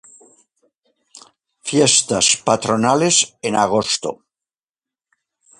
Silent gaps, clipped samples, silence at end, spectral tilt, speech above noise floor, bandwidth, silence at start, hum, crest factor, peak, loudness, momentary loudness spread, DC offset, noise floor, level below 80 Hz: none; under 0.1%; 1.45 s; -2.5 dB/octave; over 73 dB; 11.5 kHz; 1.65 s; none; 20 dB; 0 dBFS; -16 LUFS; 8 LU; under 0.1%; under -90 dBFS; -58 dBFS